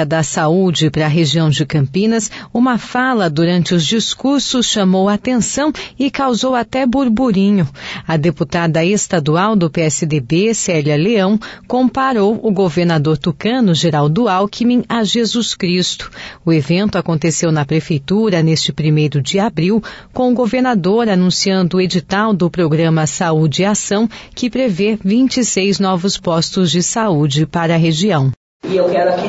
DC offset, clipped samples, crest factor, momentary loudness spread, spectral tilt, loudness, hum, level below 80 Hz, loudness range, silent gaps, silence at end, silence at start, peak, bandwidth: under 0.1%; under 0.1%; 10 dB; 4 LU; -5 dB/octave; -14 LUFS; none; -46 dBFS; 1 LU; 28.37-28.60 s; 0 s; 0 s; -4 dBFS; 8 kHz